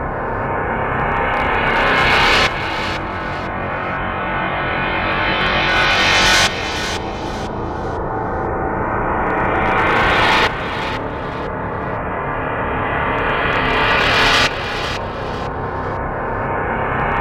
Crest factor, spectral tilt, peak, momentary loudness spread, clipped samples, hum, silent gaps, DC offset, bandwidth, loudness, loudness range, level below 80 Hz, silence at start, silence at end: 16 dB; -4 dB/octave; -2 dBFS; 11 LU; under 0.1%; none; none; under 0.1%; 16 kHz; -17 LUFS; 4 LU; -32 dBFS; 0 s; 0 s